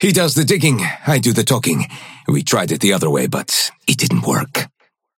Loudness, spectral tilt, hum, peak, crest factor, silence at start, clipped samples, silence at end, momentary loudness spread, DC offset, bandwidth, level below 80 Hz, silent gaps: -16 LUFS; -4 dB/octave; none; 0 dBFS; 16 dB; 0 s; under 0.1%; 0.55 s; 8 LU; under 0.1%; 17 kHz; -56 dBFS; none